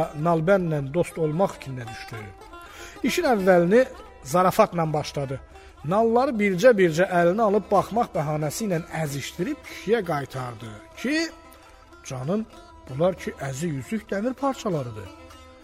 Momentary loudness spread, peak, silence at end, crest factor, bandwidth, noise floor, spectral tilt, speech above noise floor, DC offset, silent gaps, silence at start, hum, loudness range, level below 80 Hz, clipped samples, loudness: 19 LU; -4 dBFS; 0.1 s; 20 dB; 16 kHz; -49 dBFS; -6 dB/octave; 25 dB; under 0.1%; none; 0 s; none; 8 LU; -52 dBFS; under 0.1%; -24 LUFS